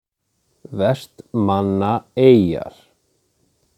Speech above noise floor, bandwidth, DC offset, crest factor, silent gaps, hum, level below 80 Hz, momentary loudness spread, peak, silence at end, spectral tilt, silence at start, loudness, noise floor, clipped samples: 52 dB; 13 kHz; under 0.1%; 20 dB; none; none; -54 dBFS; 15 LU; 0 dBFS; 1.1 s; -8.5 dB/octave; 0.7 s; -18 LUFS; -69 dBFS; under 0.1%